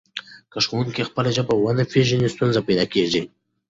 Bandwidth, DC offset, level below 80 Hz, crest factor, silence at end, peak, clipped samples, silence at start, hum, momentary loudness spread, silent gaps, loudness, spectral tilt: 8 kHz; under 0.1%; -52 dBFS; 18 dB; 0.4 s; -4 dBFS; under 0.1%; 0.15 s; none; 14 LU; none; -21 LUFS; -5.5 dB/octave